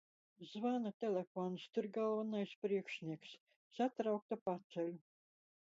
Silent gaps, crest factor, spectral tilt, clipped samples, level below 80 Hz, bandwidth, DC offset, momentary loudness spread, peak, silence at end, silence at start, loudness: 0.94-1.00 s, 1.27-1.35 s, 2.56-2.62 s, 3.40-3.46 s, 3.56-3.70 s, 4.22-4.29 s, 4.41-4.46 s, 4.64-4.70 s; 16 dB; -5.5 dB/octave; under 0.1%; under -90 dBFS; 7.6 kHz; under 0.1%; 14 LU; -26 dBFS; 0.8 s; 0.4 s; -42 LUFS